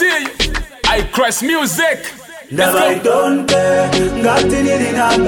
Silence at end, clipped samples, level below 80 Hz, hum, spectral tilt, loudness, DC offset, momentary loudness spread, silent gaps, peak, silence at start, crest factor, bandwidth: 0 s; under 0.1%; -30 dBFS; none; -3.5 dB/octave; -14 LUFS; under 0.1%; 5 LU; none; -2 dBFS; 0 s; 12 dB; 17.5 kHz